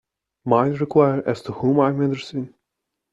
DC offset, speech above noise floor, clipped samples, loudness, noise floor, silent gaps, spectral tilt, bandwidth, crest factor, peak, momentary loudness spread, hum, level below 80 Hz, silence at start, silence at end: under 0.1%; 61 dB; under 0.1%; -20 LUFS; -81 dBFS; none; -8.5 dB/octave; 8 kHz; 18 dB; -4 dBFS; 13 LU; none; -60 dBFS; 0.45 s; 0.65 s